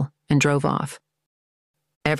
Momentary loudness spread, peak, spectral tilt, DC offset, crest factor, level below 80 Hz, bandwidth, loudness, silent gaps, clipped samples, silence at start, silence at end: 9 LU; -6 dBFS; -5.5 dB/octave; under 0.1%; 20 dB; -54 dBFS; 12.5 kHz; -22 LUFS; 1.26-1.74 s, 1.96-2.01 s; under 0.1%; 0 s; 0 s